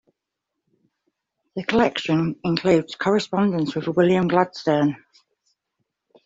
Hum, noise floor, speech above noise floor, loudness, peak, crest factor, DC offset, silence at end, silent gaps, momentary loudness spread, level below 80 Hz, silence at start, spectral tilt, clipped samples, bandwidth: none; -82 dBFS; 62 dB; -21 LUFS; -4 dBFS; 20 dB; under 0.1%; 1.3 s; none; 6 LU; -58 dBFS; 1.55 s; -6.5 dB/octave; under 0.1%; 7.8 kHz